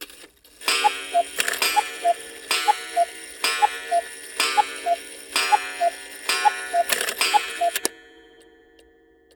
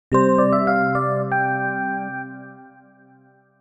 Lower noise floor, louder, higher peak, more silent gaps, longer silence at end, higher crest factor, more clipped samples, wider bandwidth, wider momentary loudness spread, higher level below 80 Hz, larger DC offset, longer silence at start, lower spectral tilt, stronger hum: about the same, -56 dBFS vs -54 dBFS; second, -23 LUFS vs -20 LUFS; about the same, -2 dBFS vs -4 dBFS; neither; first, 1.35 s vs 0.95 s; about the same, 22 dB vs 18 dB; neither; first, over 20 kHz vs 8.6 kHz; second, 6 LU vs 15 LU; second, -66 dBFS vs -54 dBFS; neither; about the same, 0 s vs 0.1 s; second, 1 dB/octave vs -8.5 dB/octave; neither